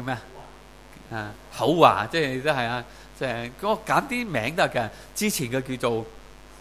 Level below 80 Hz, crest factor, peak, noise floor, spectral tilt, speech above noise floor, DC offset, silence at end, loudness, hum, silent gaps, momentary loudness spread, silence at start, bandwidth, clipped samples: -52 dBFS; 24 dB; 0 dBFS; -47 dBFS; -4.5 dB/octave; 22 dB; 0.2%; 0 s; -25 LUFS; none; none; 17 LU; 0 s; 16 kHz; under 0.1%